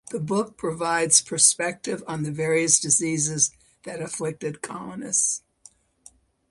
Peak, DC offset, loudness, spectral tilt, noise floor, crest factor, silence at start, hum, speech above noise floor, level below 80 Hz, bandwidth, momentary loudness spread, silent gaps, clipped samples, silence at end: 0 dBFS; under 0.1%; -22 LUFS; -2.5 dB/octave; -55 dBFS; 24 dB; 0.05 s; none; 31 dB; -64 dBFS; 11.5 kHz; 16 LU; none; under 0.1%; 1.1 s